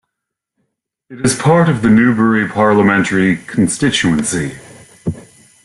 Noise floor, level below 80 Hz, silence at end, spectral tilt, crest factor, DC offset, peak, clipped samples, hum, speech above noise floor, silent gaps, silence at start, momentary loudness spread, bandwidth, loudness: -79 dBFS; -46 dBFS; 0.45 s; -5 dB/octave; 14 dB; under 0.1%; -2 dBFS; under 0.1%; none; 66 dB; none; 1.1 s; 14 LU; 12 kHz; -13 LUFS